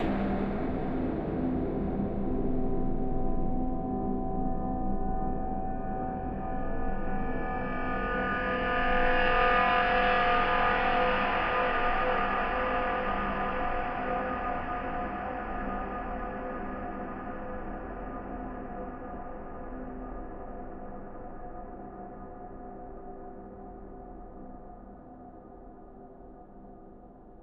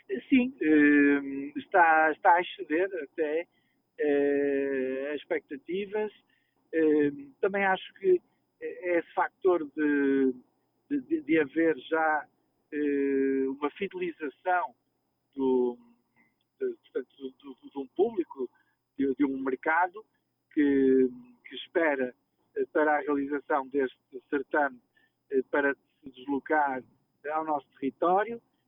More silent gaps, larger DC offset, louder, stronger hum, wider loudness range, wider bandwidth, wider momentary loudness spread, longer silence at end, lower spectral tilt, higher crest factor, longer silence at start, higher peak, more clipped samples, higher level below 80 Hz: neither; neither; second, -31 LUFS vs -28 LUFS; neither; first, 20 LU vs 6 LU; first, 5.4 kHz vs 3.8 kHz; first, 21 LU vs 14 LU; second, 0 s vs 0.3 s; about the same, -8.5 dB/octave vs -9 dB/octave; about the same, 20 dB vs 18 dB; about the same, 0 s vs 0.1 s; about the same, -12 dBFS vs -10 dBFS; neither; first, -38 dBFS vs -72 dBFS